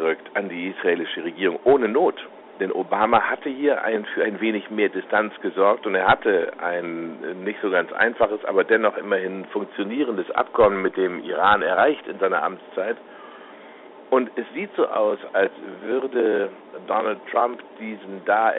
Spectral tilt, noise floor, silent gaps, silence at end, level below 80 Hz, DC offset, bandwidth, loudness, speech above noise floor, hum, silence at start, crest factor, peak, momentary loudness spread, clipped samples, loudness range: -2.5 dB/octave; -43 dBFS; none; 0 s; -62 dBFS; under 0.1%; 4.1 kHz; -22 LUFS; 21 dB; none; 0 s; 18 dB; -4 dBFS; 12 LU; under 0.1%; 4 LU